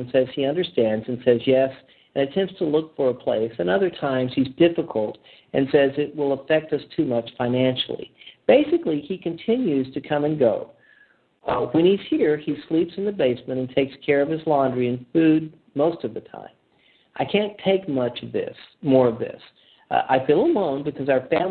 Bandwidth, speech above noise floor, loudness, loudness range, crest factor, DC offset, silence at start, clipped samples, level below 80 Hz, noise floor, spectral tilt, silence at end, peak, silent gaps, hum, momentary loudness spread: 4.6 kHz; 38 dB; -22 LUFS; 2 LU; 20 dB; under 0.1%; 0 s; under 0.1%; -60 dBFS; -60 dBFS; -10.5 dB/octave; 0 s; -4 dBFS; none; none; 11 LU